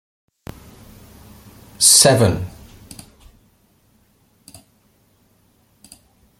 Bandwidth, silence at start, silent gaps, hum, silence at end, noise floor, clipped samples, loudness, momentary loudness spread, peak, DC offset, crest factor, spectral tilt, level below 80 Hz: 17 kHz; 1.8 s; none; none; 3.9 s; -59 dBFS; under 0.1%; -12 LUFS; 31 LU; 0 dBFS; under 0.1%; 22 dB; -2.5 dB/octave; -50 dBFS